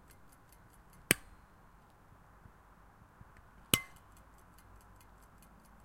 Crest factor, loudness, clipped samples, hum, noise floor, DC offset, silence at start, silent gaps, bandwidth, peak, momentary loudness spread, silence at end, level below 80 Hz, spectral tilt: 38 dB; -33 LUFS; under 0.1%; none; -61 dBFS; under 0.1%; 1.1 s; none; 16 kHz; -6 dBFS; 28 LU; 2 s; -62 dBFS; -2 dB/octave